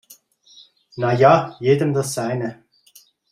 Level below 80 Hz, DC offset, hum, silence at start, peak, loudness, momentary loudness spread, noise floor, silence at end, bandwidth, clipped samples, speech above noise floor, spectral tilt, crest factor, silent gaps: -60 dBFS; under 0.1%; none; 0.95 s; -2 dBFS; -19 LUFS; 13 LU; -53 dBFS; 0.8 s; 15.5 kHz; under 0.1%; 35 dB; -6 dB/octave; 18 dB; none